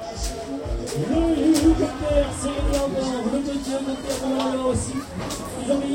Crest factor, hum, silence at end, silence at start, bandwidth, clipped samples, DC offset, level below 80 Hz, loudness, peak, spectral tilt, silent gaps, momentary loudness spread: 16 dB; none; 0 s; 0 s; 16.5 kHz; under 0.1%; under 0.1%; -34 dBFS; -24 LUFS; -6 dBFS; -5.5 dB/octave; none; 11 LU